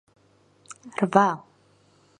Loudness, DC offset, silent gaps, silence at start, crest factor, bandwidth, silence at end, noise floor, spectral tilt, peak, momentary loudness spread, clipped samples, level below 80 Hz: -24 LUFS; under 0.1%; none; 0.85 s; 26 dB; 10.5 kHz; 0.8 s; -60 dBFS; -6 dB/octave; -2 dBFS; 25 LU; under 0.1%; -74 dBFS